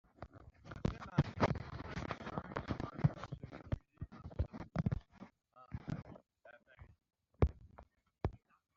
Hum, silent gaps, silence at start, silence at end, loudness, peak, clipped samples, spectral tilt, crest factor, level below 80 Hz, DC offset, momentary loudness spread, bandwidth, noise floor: none; none; 0.2 s; 0.4 s; -41 LUFS; -16 dBFS; under 0.1%; -7 dB/octave; 26 dB; -52 dBFS; under 0.1%; 23 LU; 7.4 kHz; -63 dBFS